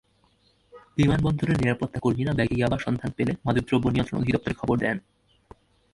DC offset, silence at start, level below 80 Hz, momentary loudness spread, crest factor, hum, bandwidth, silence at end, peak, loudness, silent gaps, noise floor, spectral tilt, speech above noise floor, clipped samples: under 0.1%; 0.75 s; -44 dBFS; 5 LU; 18 dB; none; 11.5 kHz; 0.95 s; -8 dBFS; -25 LUFS; none; -64 dBFS; -7.5 dB/octave; 40 dB; under 0.1%